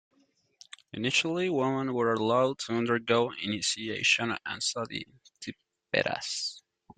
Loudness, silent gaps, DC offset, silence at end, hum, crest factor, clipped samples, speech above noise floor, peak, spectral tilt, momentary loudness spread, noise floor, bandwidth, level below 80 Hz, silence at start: -29 LUFS; none; under 0.1%; 0.4 s; none; 20 dB; under 0.1%; 40 dB; -10 dBFS; -3.5 dB/octave; 17 LU; -70 dBFS; 9.6 kHz; -70 dBFS; 0.95 s